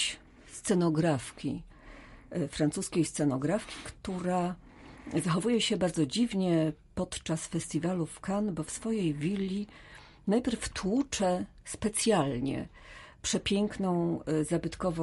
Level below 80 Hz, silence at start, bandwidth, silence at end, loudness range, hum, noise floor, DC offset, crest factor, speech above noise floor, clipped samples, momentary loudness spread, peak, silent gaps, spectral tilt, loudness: -54 dBFS; 0 s; 11.5 kHz; 0 s; 2 LU; none; -51 dBFS; under 0.1%; 16 dB; 20 dB; under 0.1%; 13 LU; -14 dBFS; none; -5 dB/octave; -31 LUFS